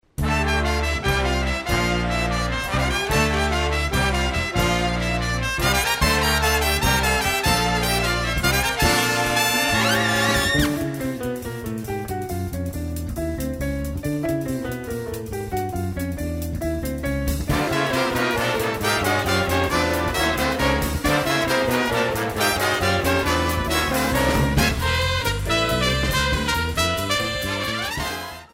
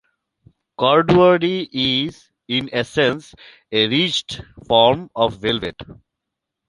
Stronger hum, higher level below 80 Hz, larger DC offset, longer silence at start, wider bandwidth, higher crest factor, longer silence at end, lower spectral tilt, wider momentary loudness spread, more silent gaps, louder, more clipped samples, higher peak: neither; first, -30 dBFS vs -50 dBFS; neither; second, 0.2 s vs 0.8 s; first, 16.5 kHz vs 11.5 kHz; about the same, 18 dB vs 18 dB; second, 0.1 s vs 0.75 s; second, -4 dB/octave vs -5.5 dB/octave; second, 9 LU vs 12 LU; neither; second, -21 LUFS vs -18 LUFS; neither; about the same, -4 dBFS vs -2 dBFS